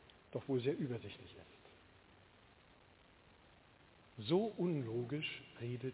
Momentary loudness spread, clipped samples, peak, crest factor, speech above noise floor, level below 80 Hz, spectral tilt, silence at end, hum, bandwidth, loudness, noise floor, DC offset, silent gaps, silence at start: 23 LU; under 0.1%; -22 dBFS; 20 dB; 26 dB; -74 dBFS; -6 dB/octave; 0 s; none; 4 kHz; -41 LUFS; -66 dBFS; under 0.1%; none; 0.3 s